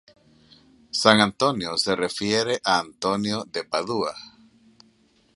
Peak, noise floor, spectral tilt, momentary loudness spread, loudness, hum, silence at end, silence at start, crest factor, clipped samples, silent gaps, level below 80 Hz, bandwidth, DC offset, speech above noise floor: 0 dBFS; -61 dBFS; -3.5 dB/octave; 11 LU; -23 LUFS; none; 1.1 s; 0.95 s; 24 dB; under 0.1%; none; -60 dBFS; 11.5 kHz; under 0.1%; 38 dB